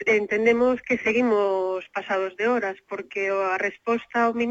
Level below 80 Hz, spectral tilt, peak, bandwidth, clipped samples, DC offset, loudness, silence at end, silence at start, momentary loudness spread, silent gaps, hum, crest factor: -62 dBFS; -5 dB/octave; -8 dBFS; 7.8 kHz; under 0.1%; under 0.1%; -24 LUFS; 0 s; 0 s; 8 LU; none; none; 16 dB